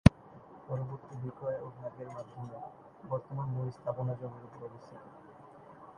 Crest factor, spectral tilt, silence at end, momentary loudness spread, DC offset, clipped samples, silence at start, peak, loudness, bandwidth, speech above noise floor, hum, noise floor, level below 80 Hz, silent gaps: 34 dB; -8 dB/octave; 0.05 s; 17 LU; under 0.1%; under 0.1%; 0.05 s; -2 dBFS; -38 LUFS; 11 kHz; 14 dB; none; -54 dBFS; -46 dBFS; none